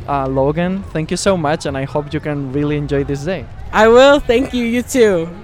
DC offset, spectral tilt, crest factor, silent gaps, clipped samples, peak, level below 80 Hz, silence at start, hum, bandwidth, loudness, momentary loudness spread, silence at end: under 0.1%; -5.5 dB/octave; 14 dB; none; under 0.1%; 0 dBFS; -34 dBFS; 0 s; none; 15.5 kHz; -15 LUFS; 12 LU; 0 s